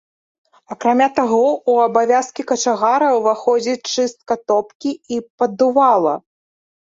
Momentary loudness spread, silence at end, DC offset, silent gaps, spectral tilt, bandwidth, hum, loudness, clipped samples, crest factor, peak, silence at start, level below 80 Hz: 10 LU; 0.75 s; under 0.1%; 4.75-4.80 s, 5.30-5.38 s; -3.5 dB/octave; 7.8 kHz; none; -17 LUFS; under 0.1%; 16 dB; -2 dBFS; 0.7 s; -64 dBFS